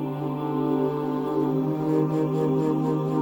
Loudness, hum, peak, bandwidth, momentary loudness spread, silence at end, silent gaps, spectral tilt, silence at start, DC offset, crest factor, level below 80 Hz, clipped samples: -25 LUFS; none; -10 dBFS; 17 kHz; 4 LU; 0 s; none; -9.5 dB/octave; 0 s; under 0.1%; 14 dB; -64 dBFS; under 0.1%